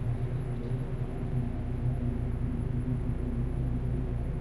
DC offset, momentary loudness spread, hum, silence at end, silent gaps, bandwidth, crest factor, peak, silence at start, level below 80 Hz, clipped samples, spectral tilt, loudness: under 0.1%; 2 LU; none; 0 s; none; 11.5 kHz; 12 dB; -18 dBFS; 0 s; -36 dBFS; under 0.1%; -9.5 dB/octave; -33 LUFS